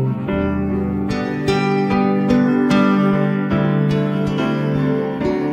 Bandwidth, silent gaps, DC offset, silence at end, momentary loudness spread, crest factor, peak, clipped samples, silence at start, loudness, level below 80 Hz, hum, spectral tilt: 9.4 kHz; none; under 0.1%; 0 s; 5 LU; 14 dB; -4 dBFS; under 0.1%; 0 s; -18 LUFS; -40 dBFS; none; -8 dB/octave